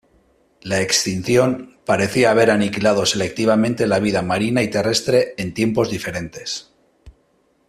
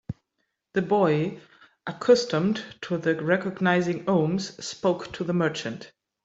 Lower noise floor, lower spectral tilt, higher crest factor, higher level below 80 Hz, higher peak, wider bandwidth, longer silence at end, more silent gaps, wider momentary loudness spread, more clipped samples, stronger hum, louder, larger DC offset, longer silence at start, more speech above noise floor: second, -61 dBFS vs -78 dBFS; second, -4.5 dB/octave vs -6 dB/octave; about the same, 18 dB vs 18 dB; first, -50 dBFS vs -62 dBFS; first, -2 dBFS vs -8 dBFS; first, 14.5 kHz vs 8 kHz; first, 0.6 s vs 0.35 s; neither; second, 11 LU vs 16 LU; neither; neither; first, -18 LUFS vs -25 LUFS; neither; first, 0.65 s vs 0.1 s; second, 43 dB vs 53 dB